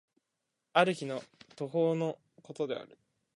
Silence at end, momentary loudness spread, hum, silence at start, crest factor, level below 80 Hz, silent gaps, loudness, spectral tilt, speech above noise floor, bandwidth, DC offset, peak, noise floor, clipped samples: 0.5 s; 14 LU; none; 0.75 s; 26 dB; -84 dBFS; none; -33 LUFS; -6 dB/octave; 53 dB; 11.5 kHz; under 0.1%; -8 dBFS; -85 dBFS; under 0.1%